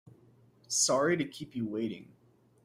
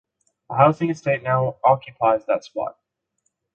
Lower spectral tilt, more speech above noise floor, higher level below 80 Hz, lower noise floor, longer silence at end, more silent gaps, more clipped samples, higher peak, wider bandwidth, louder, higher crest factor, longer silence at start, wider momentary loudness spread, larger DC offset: second, -3 dB/octave vs -7.5 dB/octave; second, 31 dB vs 54 dB; second, -74 dBFS vs -62 dBFS; second, -62 dBFS vs -74 dBFS; second, 0.6 s vs 0.85 s; neither; neither; second, -16 dBFS vs -2 dBFS; first, 16 kHz vs 7.6 kHz; second, -31 LUFS vs -21 LUFS; about the same, 18 dB vs 20 dB; first, 0.7 s vs 0.5 s; about the same, 12 LU vs 12 LU; neither